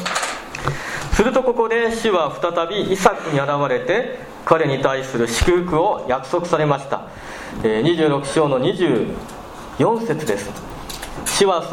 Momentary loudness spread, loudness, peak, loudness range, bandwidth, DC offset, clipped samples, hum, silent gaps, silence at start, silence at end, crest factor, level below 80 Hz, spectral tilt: 13 LU; -19 LUFS; 0 dBFS; 2 LU; 16.5 kHz; under 0.1%; under 0.1%; none; none; 0 s; 0 s; 20 dB; -36 dBFS; -4.5 dB/octave